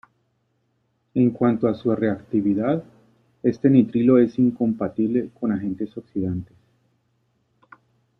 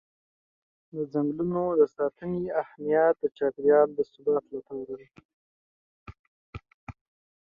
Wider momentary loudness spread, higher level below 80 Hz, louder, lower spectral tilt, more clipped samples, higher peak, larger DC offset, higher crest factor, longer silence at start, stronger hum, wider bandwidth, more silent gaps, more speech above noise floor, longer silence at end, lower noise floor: second, 11 LU vs 25 LU; about the same, -60 dBFS vs -62 dBFS; first, -22 LUFS vs -27 LUFS; about the same, -10.5 dB/octave vs -10 dB/octave; neither; first, -4 dBFS vs -10 dBFS; neither; about the same, 18 dB vs 18 dB; first, 1.15 s vs 0.95 s; neither; first, 5.8 kHz vs 4.9 kHz; second, none vs 5.25-6.06 s, 6.19-6.53 s, 6.74-6.87 s; second, 49 dB vs over 64 dB; first, 1.75 s vs 0.55 s; second, -69 dBFS vs under -90 dBFS